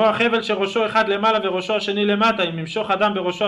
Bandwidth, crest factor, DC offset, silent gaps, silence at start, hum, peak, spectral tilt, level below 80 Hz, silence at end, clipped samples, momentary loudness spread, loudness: 11 kHz; 14 dB; under 0.1%; none; 0 s; none; -6 dBFS; -5 dB/octave; -58 dBFS; 0 s; under 0.1%; 5 LU; -19 LUFS